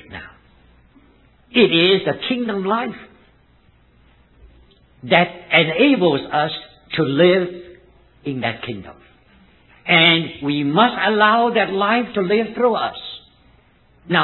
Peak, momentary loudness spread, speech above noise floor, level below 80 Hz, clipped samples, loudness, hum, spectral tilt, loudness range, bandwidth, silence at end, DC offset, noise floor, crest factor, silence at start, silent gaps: 0 dBFS; 18 LU; 37 dB; -54 dBFS; under 0.1%; -17 LUFS; none; -9.5 dB/octave; 6 LU; 4.3 kHz; 0 s; under 0.1%; -54 dBFS; 20 dB; 0.1 s; none